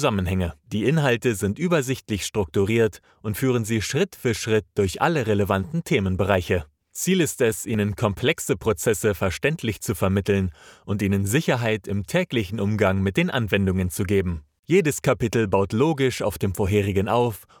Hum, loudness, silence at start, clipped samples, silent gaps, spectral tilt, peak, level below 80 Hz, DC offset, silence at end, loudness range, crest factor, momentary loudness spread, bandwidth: none; -23 LUFS; 0 s; under 0.1%; 14.59-14.63 s; -5.5 dB/octave; -4 dBFS; -50 dBFS; under 0.1%; 0.2 s; 2 LU; 18 dB; 6 LU; 19.5 kHz